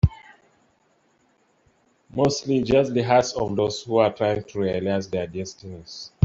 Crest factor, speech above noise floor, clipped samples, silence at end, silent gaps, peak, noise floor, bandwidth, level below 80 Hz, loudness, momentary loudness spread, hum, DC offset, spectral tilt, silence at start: 20 dB; 42 dB; under 0.1%; 0.2 s; none; -4 dBFS; -64 dBFS; 7.8 kHz; -44 dBFS; -23 LUFS; 15 LU; none; under 0.1%; -6 dB/octave; 0.05 s